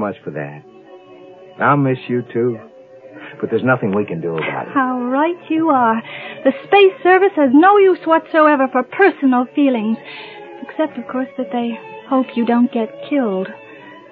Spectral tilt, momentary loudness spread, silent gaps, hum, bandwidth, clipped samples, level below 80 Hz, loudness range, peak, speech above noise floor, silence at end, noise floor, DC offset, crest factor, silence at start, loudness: -9.5 dB/octave; 17 LU; none; none; 4.6 kHz; under 0.1%; -72 dBFS; 8 LU; 0 dBFS; 24 dB; 0.15 s; -40 dBFS; under 0.1%; 16 dB; 0 s; -16 LUFS